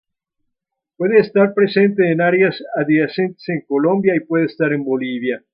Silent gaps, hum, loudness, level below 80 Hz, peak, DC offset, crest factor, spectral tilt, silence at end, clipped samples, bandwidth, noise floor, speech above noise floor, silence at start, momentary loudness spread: none; none; -17 LUFS; -66 dBFS; -2 dBFS; under 0.1%; 16 dB; -11.5 dB/octave; 0.15 s; under 0.1%; 5.4 kHz; -78 dBFS; 62 dB; 1 s; 8 LU